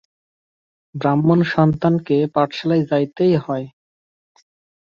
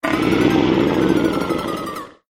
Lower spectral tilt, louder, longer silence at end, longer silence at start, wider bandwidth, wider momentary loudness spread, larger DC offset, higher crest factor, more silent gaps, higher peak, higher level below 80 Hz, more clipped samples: first, -9 dB/octave vs -6 dB/octave; about the same, -18 LUFS vs -18 LUFS; first, 1.15 s vs 0.2 s; first, 0.95 s vs 0.05 s; second, 6.8 kHz vs 16.5 kHz; about the same, 11 LU vs 11 LU; neither; about the same, 16 dB vs 14 dB; neither; about the same, -4 dBFS vs -4 dBFS; second, -56 dBFS vs -42 dBFS; neither